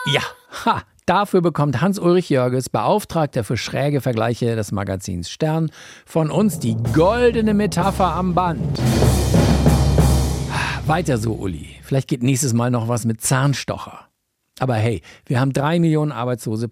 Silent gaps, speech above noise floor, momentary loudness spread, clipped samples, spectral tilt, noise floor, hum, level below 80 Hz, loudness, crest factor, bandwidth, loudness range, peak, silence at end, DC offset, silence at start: none; 51 dB; 8 LU; under 0.1%; -6 dB/octave; -69 dBFS; none; -30 dBFS; -19 LUFS; 16 dB; 16.5 kHz; 4 LU; -2 dBFS; 0 s; under 0.1%; 0 s